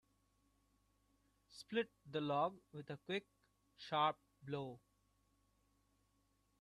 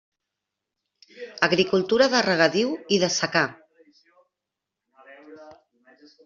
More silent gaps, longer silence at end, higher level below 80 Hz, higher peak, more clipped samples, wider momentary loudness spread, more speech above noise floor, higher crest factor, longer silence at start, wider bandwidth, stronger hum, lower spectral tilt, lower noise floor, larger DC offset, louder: neither; first, 1.85 s vs 0.75 s; second, -82 dBFS vs -66 dBFS; second, -24 dBFS vs -2 dBFS; neither; first, 19 LU vs 8 LU; second, 37 dB vs 64 dB; about the same, 22 dB vs 22 dB; first, 1.5 s vs 1.15 s; first, 13 kHz vs 7.6 kHz; first, 50 Hz at -75 dBFS vs none; first, -6 dB/octave vs -3.5 dB/octave; second, -80 dBFS vs -86 dBFS; neither; second, -43 LUFS vs -21 LUFS